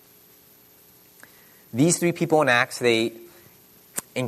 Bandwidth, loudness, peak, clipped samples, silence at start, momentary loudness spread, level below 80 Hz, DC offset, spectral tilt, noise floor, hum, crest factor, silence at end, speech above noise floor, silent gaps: 13.5 kHz; -22 LUFS; -6 dBFS; under 0.1%; 1.75 s; 15 LU; -68 dBFS; under 0.1%; -4 dB/octave; -54 dBFS; none; 20 dB; 0 s; 33 dB; none